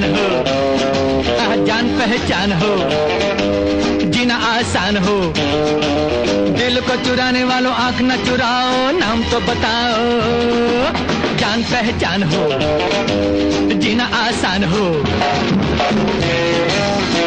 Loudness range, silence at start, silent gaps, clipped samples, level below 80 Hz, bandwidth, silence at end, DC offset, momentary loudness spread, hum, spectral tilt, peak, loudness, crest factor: 1 LU; 0 s; none; under 0.1%; -36 dBFS; 9.6 kHz; 0 s; under 0.1%; 1 LU; none; -5 dB/octave; -2 dBFS; -15 LUFS; 14 dB